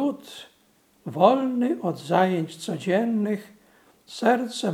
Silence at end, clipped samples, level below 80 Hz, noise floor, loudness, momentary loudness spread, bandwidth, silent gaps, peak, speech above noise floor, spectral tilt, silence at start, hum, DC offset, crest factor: 0 s; under 0.1%; -76 dBFS; -62 dBFS; -24 LUFS; 20 LU; 15.5 kHz; none; -2 dBFS; 38 dB; -6 dB/octave; 0 s; none; under 0.1%; 22 dB